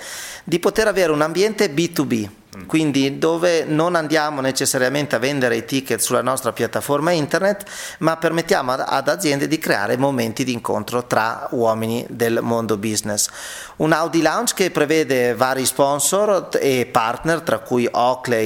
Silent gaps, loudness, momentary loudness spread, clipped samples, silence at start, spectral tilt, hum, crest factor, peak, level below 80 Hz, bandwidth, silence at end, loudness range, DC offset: none; -19 LUFS; 5 LU; under 0.1%; 0 s; -4 dB/octave; none; 20 dB; 0 dBFS; -54 dBFS; 19 kHz; 0 s; 2 LU; under 0.1%